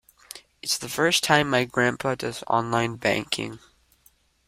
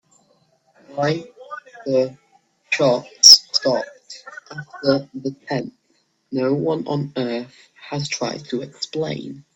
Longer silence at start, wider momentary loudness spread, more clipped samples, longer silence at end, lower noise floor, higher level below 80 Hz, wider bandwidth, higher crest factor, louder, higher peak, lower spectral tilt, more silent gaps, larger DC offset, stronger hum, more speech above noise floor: second, 0.35 s vs 0.9 s; second, 15 LU vs 25 LU; neither; first, 0.9 s vs 0.15 s; about the same, -62 dBFS vs -65 dBFS; about the same, -60 dBFS vs -64 dBFS; about the same, 16 kHz vs 16 kHz; about the same, 24 dB vs 22 dB; second, -24 LUFS vs -18 LUFS; about the same, -2 dBFS vs 0 dBFS; about the same, -3.5 dB/octave vs -2.5 dB/octave; neither; neither; neither; second, 38 dB vs 42 dB